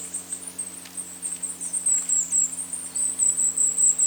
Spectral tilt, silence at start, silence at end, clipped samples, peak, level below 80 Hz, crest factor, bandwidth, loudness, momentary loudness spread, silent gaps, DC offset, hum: 0.5 dB/octave; 0 s; 0 s; under 0.1%; -10 dBFS; -72 dBFS; 16 dB; over 20 kHz; -22 LUFS; 13 LU; none; under 0.1%; none